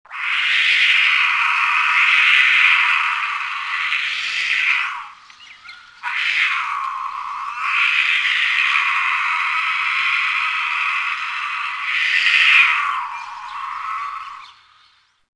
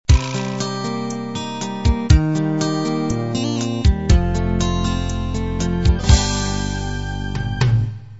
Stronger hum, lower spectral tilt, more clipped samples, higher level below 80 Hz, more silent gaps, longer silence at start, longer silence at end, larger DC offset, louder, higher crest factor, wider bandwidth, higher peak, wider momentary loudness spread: neither; second, 3 dB/octave vs -5.5 dB/octave; neither; second, -68 dBFS vs -22 dBFS; neither; about the same, 0.1 s vs 0.1 s; first, 0.85 s vs 0 s; second, under 0.1% vs 0.6%; first, -16 LUFS vs -20 LUFS; about the same, 18 dB vs 18 dB; first, 10.5 kHz vs 8 kHz; about the same, 0 dBFS vs 0 dBFS; first, 15 LU vs 9 LU